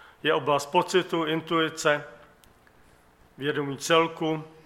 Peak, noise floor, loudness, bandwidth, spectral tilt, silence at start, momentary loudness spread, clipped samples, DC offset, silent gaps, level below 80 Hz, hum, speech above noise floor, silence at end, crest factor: -8 dBFS; -58 dBFS; -26 LUFS; 16 kHz; -4 dB/octave; 0.25 s; 7 LU; under 0.1%; under 0.1%; none; -66 dBFS; none; 32 dB; 0.2 s; 20 dB